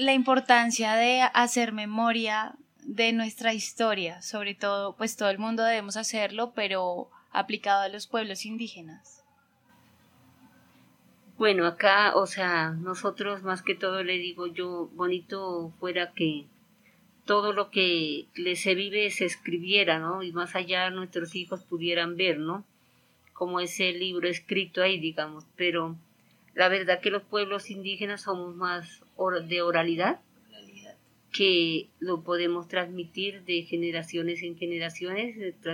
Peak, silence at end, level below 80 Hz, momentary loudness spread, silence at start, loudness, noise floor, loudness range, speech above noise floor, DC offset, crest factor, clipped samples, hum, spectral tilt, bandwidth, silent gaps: -6 dBFS; 0 s; -82 dBFS; 12 LU; 0 s; -27 LUFS; -65 dBFS; 5 LU; 37 dB; under 0.1%; 24 dB; under 0.1%; none; -3.5 dB/octave; 16.5 kHz; none